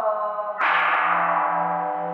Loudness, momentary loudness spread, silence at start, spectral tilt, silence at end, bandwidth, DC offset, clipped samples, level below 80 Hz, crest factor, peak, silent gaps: -22 LUFS; 7 LU; 0 s; -6 dB/octave; 0 s; 6.8 kHz; under 0.1%; under 0.1%; -88 dBFS; 14 dB; -8 dBFS; none